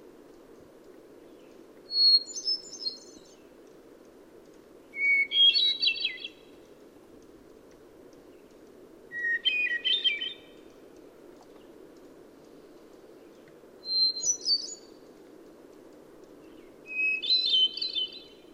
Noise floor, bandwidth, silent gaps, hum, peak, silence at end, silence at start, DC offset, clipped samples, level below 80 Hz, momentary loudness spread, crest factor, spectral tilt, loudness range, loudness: -53 dBFS; 16 kHz; none; none; -12 dBFS; 0.25 s; 0.9 s; under 0.1%; under 0.1%; -72 dBFS; 21 LU; 20 dB; 2 dB/octave; 8 LU; -24 LUFS